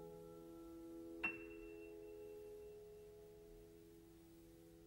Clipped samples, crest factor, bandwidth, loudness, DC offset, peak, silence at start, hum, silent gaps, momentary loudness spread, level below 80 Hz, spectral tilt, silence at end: under 0.1%; 26 dB; 16 kHz; -54 LUFS; under 0.1%; -30 dBFS; 0 s; none; none; 18 LU; -72 dBFS; -5 dB/octave; 0 s